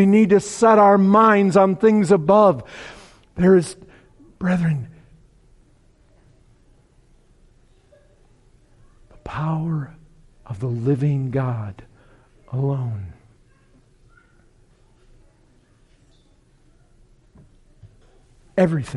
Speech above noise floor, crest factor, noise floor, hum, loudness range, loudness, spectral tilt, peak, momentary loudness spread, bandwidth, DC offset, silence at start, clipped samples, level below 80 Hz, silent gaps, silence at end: 39 dB; 18 dB; -56 dBFS; none; 16 LU; -18 LUFS; -7.5 dB/octave; -4 dBFS; 24 LU; 11.5 kHz; under 0.1%; 0 s; under 0.1%; -52 dBFS; none; 0 s